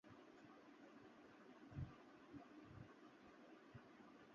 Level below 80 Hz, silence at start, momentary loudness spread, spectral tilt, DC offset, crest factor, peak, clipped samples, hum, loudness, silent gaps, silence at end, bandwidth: -72 dBFS; 0.05 s; 10 LU; -6 dB/octave; under 0.1%; 22 dB; -40 dBFS; under 0.1%; none; -62 LUFS; none; 0 s; 7 kHz